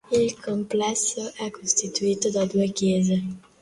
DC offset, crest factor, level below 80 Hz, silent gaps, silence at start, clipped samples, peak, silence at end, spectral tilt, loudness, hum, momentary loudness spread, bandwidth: under 0.1%; 20 dB; -60 dBFS; none; 0.1 s; under 0.1%; -4 dBFS; 0.25 s; -4.5 dB/octave; -24 LUFS; none; 8 LU; 11.5 kHz